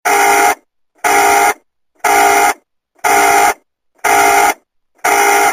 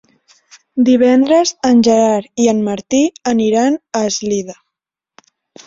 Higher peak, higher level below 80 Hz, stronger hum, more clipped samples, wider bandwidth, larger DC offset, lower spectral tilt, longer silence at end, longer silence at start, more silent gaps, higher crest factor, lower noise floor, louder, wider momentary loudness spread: about the same, 0 dBFS vs -2 dBFS; first, -50 dBFS vs -56 dBFS; neither; neither; first, 16 kHz vs 7.8 kHz; neither; second, -0.5 dB/octave vs -4.5 dB/octave; second, 0 s vs 1.15 s; second, 0.05 s vs 0.75 s; neither; about the same, 12 dB vs 14 dB; second, -52 dBFS vs -82 dBFS; first, -11 LUFS vs -14 LUFS; first, 11 LU vs 8 LU